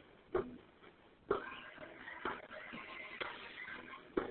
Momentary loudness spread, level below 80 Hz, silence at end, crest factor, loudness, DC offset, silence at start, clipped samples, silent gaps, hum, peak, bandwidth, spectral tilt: 17 LU; -68 dBFS; 0 s; 26 dB; -45 LUFS; under 0.1%; 0 s; under 0.1%; none; none; -20 dBFS; 4.3 kHz; -2.5 dB/octave